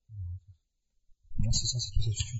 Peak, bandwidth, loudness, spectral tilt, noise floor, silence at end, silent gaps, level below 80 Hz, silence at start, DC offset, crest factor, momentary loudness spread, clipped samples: -14 dBFS; 8 kHz; -32 LUFS; -3.5 dB/octave; -75 dBFS; 0 s; none; -38 dBFS; 0.1 s; under 0.1%; 18 dB; 14 LU; under 0.1%